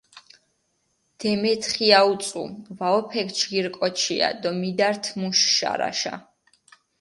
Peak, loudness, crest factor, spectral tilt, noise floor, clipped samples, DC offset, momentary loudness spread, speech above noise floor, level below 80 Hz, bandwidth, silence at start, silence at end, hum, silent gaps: -2 dBFS; -22 LUFS; 24 dB; -2.5 dB/octave; -71 dBFS; under 0.1%; under 0.1%; 12 LU; 48 dB; -68 dBFS; 11.5 kHz; 0.15 s; 0.8 s; none; none